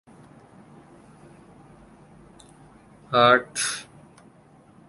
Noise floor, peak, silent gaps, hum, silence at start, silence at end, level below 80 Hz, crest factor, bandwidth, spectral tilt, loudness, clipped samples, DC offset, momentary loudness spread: -54 dBFS; -4 dBFS; none; none; 3.1 s; 1.05 s; -62 dBFS; 26 dB; 11.5 kHz; -3 dB/octave; -21 LUFS; under 0.1%; under 0.1%; 18 LU